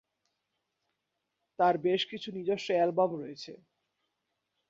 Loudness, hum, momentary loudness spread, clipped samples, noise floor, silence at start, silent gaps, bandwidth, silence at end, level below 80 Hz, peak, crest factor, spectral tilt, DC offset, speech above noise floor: -30 LUFS; none; 16 LU; under 0.1%; -84 dBFS; 1.6 s; none; 7.8 kHz; 1.15 s; -78 dBFS; -14 dBFS; 20 dB; -5.5 dB/octave; under 0.1%; 54 dB